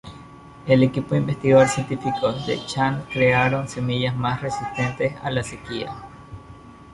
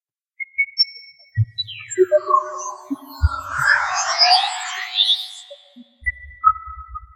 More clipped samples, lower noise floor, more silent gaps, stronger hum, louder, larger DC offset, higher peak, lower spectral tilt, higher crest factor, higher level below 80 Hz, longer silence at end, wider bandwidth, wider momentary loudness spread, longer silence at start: neither; about the same, -43 dBFS vs -46 dBFS; neither; neither; second, -22 LUFS vs -19 LUFS; neither; about the same, -4 dBFS vs -2 dBFS; first, -6 dB/octave vs -3 dB/octave; about the same, 18 dB vs 20 dB; second, -50 dBFS vs -34 dBFS; about the same, 0 s vs 0.1 s; second, 11.5 kHz vs 16 kHz; first, 19 LU vs 16 LU; second, 0.05 s vs 0.4 s